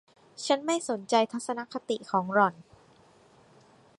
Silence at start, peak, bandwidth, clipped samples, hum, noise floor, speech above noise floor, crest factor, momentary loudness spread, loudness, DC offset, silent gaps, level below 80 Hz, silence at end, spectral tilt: 0.4 s; -8 dBFS; 11.5 kHz; under 0.1%; none; -59 dBFS; 31 dB; 22 dB; 9 LU; -28 LUFS; under 0.1%; none; -76 dBFS; 1.35 s; -4 dB/octave